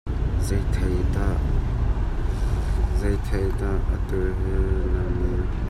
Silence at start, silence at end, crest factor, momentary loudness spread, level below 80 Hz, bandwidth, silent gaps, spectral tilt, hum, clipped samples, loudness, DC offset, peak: 0.05 s; 0 s; 12 dB; 2 LU; -24 dBFS; 12 kHz; none; -7.5 dB/octave; none; under 0.1%; -25 LUFS; under 0.1%; -10 dBFS